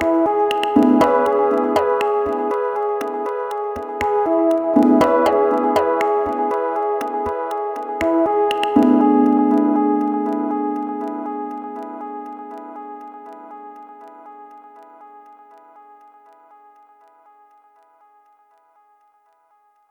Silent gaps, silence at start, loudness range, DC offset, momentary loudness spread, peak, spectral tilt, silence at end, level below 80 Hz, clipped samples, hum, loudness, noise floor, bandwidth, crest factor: none; 0 s; 18 LU; under 0.1%; 20 LU; -2 dBFS; -6 dB/octave; 4.1 s; -54 dBFS; under 0.1%; none; -18 LUFS; -59 dBFS; 19 kHz; 18 dB